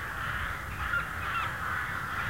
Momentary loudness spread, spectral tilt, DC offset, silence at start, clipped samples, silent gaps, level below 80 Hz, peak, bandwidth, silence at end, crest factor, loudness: 3 LU; -4 dB/octave; 0.2%; 0 s; under 0.1%; none; -46 dBFS; -20 dBFS; 16 kHz; 0 s; 14 dB; -32 LUFS